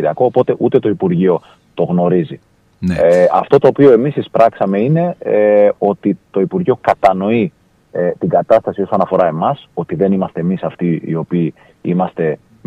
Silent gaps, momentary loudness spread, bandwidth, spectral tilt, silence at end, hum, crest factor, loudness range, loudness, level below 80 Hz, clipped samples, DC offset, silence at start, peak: none; 9 LU; 9.2 kHz; -9 dB/octave; 0.3 s; none; 14 dB; 5 LU; -14 LUFS; -50 dBFS; under 0.1%; under 0.1%; 0 s; 0 dBFS